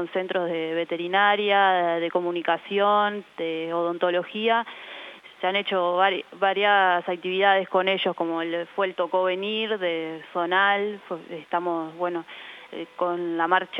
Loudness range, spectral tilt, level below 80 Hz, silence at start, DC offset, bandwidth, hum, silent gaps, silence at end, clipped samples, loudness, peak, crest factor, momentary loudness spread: 4 LU; -6 dB/octave; -82 dBFS; 0 s; under 0.1%; 6.6 kHz; none; none; 0 s; under 0.1%; -24 LUFS; -6 dBFS; 18 dB; 13 LU